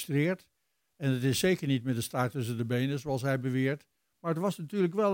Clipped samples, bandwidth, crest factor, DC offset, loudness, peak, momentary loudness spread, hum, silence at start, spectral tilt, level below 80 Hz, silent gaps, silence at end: under 0.1%; 17 kHz; 16 dB; under 0.1%; -31 LUFS; -14 dBFS; 7 LU; none; 0 s; -6 dB/octave; -66 dBFS; none; 0 s